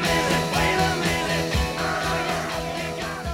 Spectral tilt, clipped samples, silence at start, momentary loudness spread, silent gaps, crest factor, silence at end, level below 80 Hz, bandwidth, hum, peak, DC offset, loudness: -4 dB/octave; under 0.1%; 0 s; 7 LU; none; 16 dB; 0 s; -36 dBFS; 17 kHz; none; -8 dBFS; under 0.1%; -23 LUFS